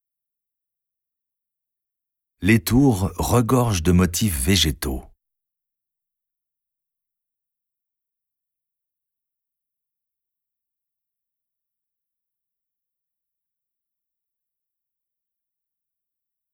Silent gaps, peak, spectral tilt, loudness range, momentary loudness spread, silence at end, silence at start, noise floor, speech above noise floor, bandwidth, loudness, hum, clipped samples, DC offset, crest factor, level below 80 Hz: none; -4 dBFS; -5 dB/octave; 7 LU; 9 LU; 11.5 s; 2.4 s; -85 dBFS; 67 dB; 18 kHz; -19 LUFS; none; under 0.1%; under 0.1%; 22 dB; -40 dBFS